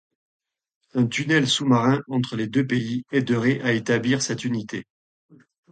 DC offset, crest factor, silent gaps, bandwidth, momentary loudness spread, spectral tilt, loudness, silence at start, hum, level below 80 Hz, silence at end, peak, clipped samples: under 0.1%; 16 dB; none; 9.4 kHz; 8 LU; -5 dB/octave; -22 LUFS; 0.95 s; none; -62 dBFS; 0.9 s; -6 dBFS; under 0.1%